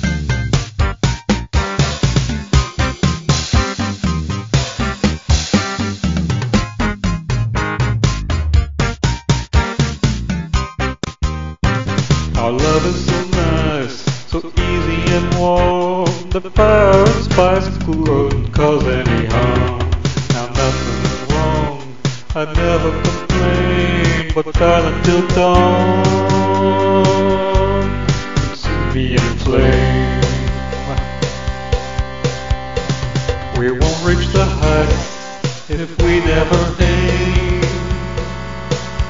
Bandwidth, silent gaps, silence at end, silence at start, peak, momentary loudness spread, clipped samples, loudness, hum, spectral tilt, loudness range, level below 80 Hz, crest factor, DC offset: 7.8 kHz; none; 0 s; 0 s; 0 dBFS; 9 LU; under 0.1%; -16 LUFS; none; -6 dB/octave; 5 LU; -22 dBFS; 16 dB; under 0.1%